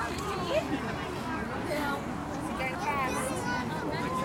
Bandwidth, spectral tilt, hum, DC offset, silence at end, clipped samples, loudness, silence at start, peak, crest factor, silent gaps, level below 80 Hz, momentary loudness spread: 16.5 kHz; -5 dB/octave; none; under 0.1%; 0 s; under 0.1%; -32 LUFS; 0 s; -16 dBFS; 16 dB; none; -50 dBFS; 4 LU